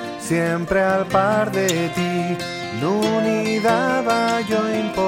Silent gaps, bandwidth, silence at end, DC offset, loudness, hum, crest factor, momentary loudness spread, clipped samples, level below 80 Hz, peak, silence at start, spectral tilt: none; 16.5 kHz; 0 s; under 0.1%; -20 LUFS; none; 16 dB; 5 LU; under 0.1%; -50 dBFS; -4 dBFS; 0 s; -5 dB/octave